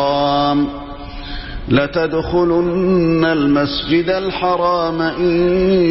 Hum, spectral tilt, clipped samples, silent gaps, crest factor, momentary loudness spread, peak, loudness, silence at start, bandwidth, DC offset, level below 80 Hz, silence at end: none; -10 dB/octave; under 0.1%; none; 12 dB; 14 LU; -2 dBFS; -16 LUFS; 0 s; 5.8 kHz; 0.1%; -34 dBFS; 0 s